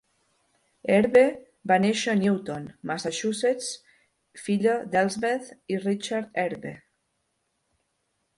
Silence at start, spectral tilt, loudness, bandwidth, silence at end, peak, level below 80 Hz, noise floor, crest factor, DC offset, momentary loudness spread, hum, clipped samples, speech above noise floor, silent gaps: 0.85 s; -5 dB/octave; -25 LUFS; 11.5 kHz; 1.6 s; -6 dBFS; -68 dBFS; -75 dBFS; 20 dB; under 0.1%; 15 LU; none; under 0.1%; 51 dB; none